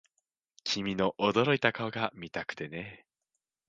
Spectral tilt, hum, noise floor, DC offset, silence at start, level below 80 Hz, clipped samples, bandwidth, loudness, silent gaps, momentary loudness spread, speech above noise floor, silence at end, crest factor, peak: -5 dB/octave; none; -86 dBFS; under 0.1%; 0.65 s; -66 dBFS; under 0.1%; 9 kHz; -31 LUFS; none; 13 LU; 55 dB; 0.7 s; 26 dB; -6 dBFS